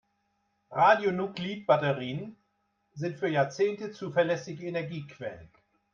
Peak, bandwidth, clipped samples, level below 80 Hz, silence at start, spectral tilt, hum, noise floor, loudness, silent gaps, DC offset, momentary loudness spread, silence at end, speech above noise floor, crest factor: -10 dBFS; 7.4 kHz; under 0.1%; -72 dBFS; 0.7 s; -6 dB/octave; none; -76 dBFS; -29 LUFS; none; under 0.1%; 16 LU; 0.5 s; 47 dB; 20 dB